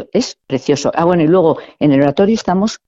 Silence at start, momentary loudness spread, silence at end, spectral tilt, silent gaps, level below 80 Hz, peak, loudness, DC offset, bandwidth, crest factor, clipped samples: 0 s; 7 LU; 0.1 s; -6 dB/octave; none; -48 dBFS; 0 dBFS; -14 LUFS; under 0.1%; 8 kHz; 14 dB; under 0.1%